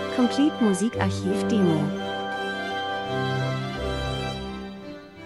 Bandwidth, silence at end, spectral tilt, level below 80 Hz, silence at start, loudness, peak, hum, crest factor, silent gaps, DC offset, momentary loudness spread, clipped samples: 12.5 kHz; 0 s; -6 dB/octave; -44 dBFS; 0 s; -25 LUFS; -8 dBFS; none; 18 dB; none; under 0.1%; 12 LU; under 0.1%